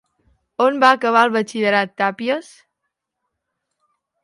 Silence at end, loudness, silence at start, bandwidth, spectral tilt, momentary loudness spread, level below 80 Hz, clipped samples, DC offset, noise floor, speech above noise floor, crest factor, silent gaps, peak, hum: 1.8 s; -17 LUFS; 0.6 s; 11.5 kHz; -4.5 dB/octave; 10 LU; -70 dBFS; under 0.1%; under 0.1%; -78 dBFS; 61 dB; 20 dB; none; 0 dBFS; none